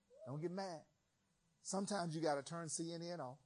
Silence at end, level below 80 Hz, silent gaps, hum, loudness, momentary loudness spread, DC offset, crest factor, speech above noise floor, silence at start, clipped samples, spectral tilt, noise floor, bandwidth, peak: 0.1 s; -88 dBFS; none; none; -44 LUFS; 10 LU; under 0.1%; 20 dB; 38 dB; 0.1 s; under 0.1%; -4.5 dB/octave; -82 dBFS; 10 kHz; -26 dBFS